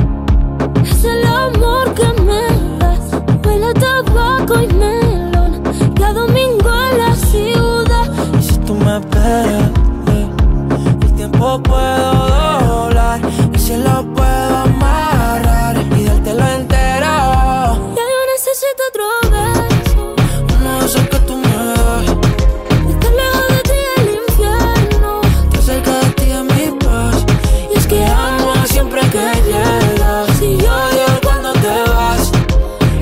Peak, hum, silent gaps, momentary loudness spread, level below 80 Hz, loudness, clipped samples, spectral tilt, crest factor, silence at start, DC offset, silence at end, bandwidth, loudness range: -2 dBFS; none; none; 3 LU; -16 dBFS; -13 LUFS; under 0.1%; -5.5 dB/octave; 10 dB; 0 s; under 0.1%; 0 s; 16.5 kHz; 1 LU